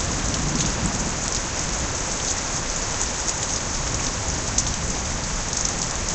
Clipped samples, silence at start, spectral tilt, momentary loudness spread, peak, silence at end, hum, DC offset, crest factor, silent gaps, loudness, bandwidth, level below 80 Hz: under 0.1%; 0 s; -2.5 dB/octave; 2 LU; -2 dBFS; 0 s; none; under 0.1%; 22 dB; none; -23 LUFS; 9 kHz; -32 dBFS